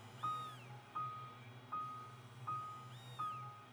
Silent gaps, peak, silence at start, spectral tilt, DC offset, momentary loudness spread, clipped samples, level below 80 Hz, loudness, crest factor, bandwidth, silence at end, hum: none; -32 dBFS; 0 s; -5 dB/octave; under 0.1%; 10 LU; under 0.1%; -82 dBFS; -47 LUFS; 16 dB; over 20 kHz; 0 s; none